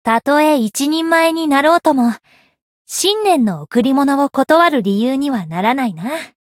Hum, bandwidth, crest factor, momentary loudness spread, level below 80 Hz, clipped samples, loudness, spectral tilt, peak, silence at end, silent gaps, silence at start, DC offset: none; 17 kHz; 14 dB; 7 LU; -62 dBFS; under 0.1%; -15 LUFS; -4 dB/octave; 0 dBFS; 0.2 s; 2.62-2.85 s; 0.05 s; under 0.1%